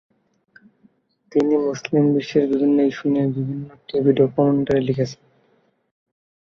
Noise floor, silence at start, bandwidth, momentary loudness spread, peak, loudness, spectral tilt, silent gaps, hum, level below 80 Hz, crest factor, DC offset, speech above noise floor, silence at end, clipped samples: -62 dBFS; 1.3 s; 7 kHz; 9 LU; -4 dBFS; -20 LUFS; -8 dB/octave; none; none; -58 dBFS; 18 dB; under 0.1%; 44 dB; 1.3 s; under 0.1%